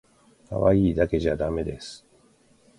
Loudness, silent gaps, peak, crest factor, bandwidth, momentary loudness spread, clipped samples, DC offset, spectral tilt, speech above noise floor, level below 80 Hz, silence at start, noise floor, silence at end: -24 LUFS; none; -6 dBFS; 20 dB; 11.5 kHz; 16 LU; under 0.1%; under 0.1%; -7.5 dB/octave; 36 dB; -40 dBFS; 0.5 s; -59 dBFS; 0.8 s